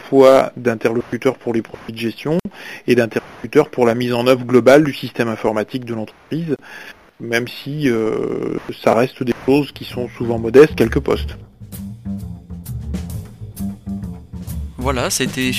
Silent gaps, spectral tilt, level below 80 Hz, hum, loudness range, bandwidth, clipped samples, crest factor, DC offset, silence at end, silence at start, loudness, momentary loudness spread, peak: none; -5.5 dB/octave; -38 dBFS; none; 10 LU; 15.5 kHz; under 0.1%; 18 dB; 0.2%; 0 s; 0 s; -17 LUFS; 20 LU; 0 dBFS